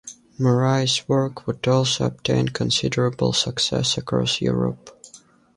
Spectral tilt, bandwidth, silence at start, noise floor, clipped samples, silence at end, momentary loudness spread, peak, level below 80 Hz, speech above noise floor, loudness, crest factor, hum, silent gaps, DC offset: -4.5 dB/octave; 11.5 kHz; 0.05 s; -50 dBFS; under 0.1%; 0.4 s; 6 LU; -6 dBFS; -50 dBFS; 29 dB; -21 LUFS; 16 dB; none; none; under 0.1%